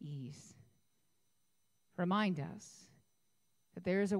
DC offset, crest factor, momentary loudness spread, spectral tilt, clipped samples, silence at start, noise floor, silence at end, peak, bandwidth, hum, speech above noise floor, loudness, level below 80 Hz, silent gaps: under 0.1%; 18 dB; 22 LU; -6.5 dB/octave; under 0.1%; 0 s; -82 dBFS; 0 s; -22 dBFS; 11.5 kHz; none; 46 dB; -38 LUFS; -78 dBFS; none